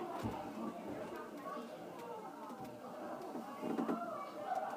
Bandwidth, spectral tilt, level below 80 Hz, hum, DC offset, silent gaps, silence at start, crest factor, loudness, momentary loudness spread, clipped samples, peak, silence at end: 15.5 kHz; -6 dB/octave; -72 dBFS; none; under 0.1%; none; 0 s; 20 dB; -45 LUFS; 9 LU; under 0.1%; -24 dBFS; 0 s